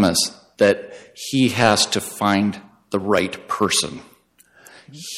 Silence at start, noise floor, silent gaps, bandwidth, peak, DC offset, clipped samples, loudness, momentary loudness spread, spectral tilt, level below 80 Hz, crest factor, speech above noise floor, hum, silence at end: 0 s; -54 dBFS; none; 16.5 kHz; -4 dBFS; under 0.1%; under 0.1%; -19 LUFS; 17 LU; -3.5 dB/octave; -58 dBFS; 18 dB; 35 dB; none; 0 s